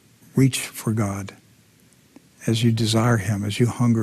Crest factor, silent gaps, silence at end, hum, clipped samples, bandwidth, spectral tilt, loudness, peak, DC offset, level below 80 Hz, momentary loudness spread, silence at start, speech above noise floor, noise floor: 16 dB; none; 0 s; none; under 0.1%; 14.5 kHz; -5.5 dB/octave; -22 LUFS; -6 dBFS; under 0.1%; -56 dBFS; 9 LU; 0.35 s; 35 dB; -55 dBFS